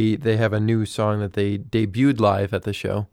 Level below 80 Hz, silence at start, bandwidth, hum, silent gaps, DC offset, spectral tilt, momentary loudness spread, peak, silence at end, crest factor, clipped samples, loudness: -52 dBFS; 0 s; 12.5 kHz; none; none; under 0.1%; -7.5 dB/octave; 7 LU; -6 dBFS; 0.05 s; 16 dB; under 0.1%; -22 LUFS